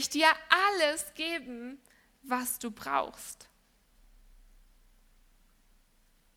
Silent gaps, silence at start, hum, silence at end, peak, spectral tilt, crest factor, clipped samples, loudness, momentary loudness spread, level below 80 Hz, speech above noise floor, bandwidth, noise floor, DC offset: none; 0 s; none; 2.95 s; -6 dBFS; -0.5 dB/octave; 28 dB; under 0.1%; -29 LUFS; 20 LU; -64 dBFS; 36 dB; 18.5 kHz; -66 dBFS; under 0.1%